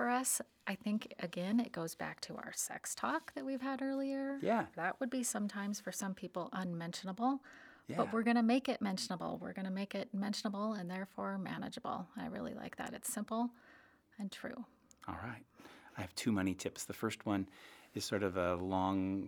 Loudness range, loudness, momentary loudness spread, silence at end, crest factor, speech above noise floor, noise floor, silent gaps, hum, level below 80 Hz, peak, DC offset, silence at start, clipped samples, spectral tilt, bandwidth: 6 LU; -39 LUFS; 11 LU; 0 s; 18 dB; 26 dB; -65 dBFS; none; none; -78 dBFS; -20 dBFS; under 0.1%; 0 s; under 0.1%; -4.5 dB/octave; over 20 kHz